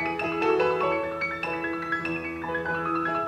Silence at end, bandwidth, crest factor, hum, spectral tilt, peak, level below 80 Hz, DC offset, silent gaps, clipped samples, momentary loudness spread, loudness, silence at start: 0 s; 12.5 kHz; 16 dB; none; -6.5 dB/octave; -12 dBFS; -56 dBFS; under 0.1%; none; under 0.1%; 7 LU; -27 LUFS; 0 s